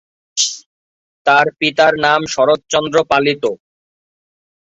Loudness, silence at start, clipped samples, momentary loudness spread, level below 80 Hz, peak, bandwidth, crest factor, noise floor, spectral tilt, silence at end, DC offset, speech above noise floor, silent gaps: -14 LUFS; 0.35 s; under 0.1%; 9 LU; -56 dBFS; 0 dBFS; 8.4 kHz; 16 dB; under -90 dBFS; -2.5 dB/octave; 1.15 s; under 0.1%; over 76 dB; 0.66-1.25 s